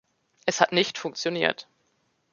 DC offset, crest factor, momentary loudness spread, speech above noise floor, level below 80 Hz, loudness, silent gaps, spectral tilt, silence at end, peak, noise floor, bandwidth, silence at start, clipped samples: under 0.1%; 26 dB; 9 LU; 46 dB; -72 dBFS; -25 LUFS; none; -3 dB/octave; 0.7 s; -2 dBFS; -71 dBFS; 7.4 kHz; 0.45 s; under 0.1%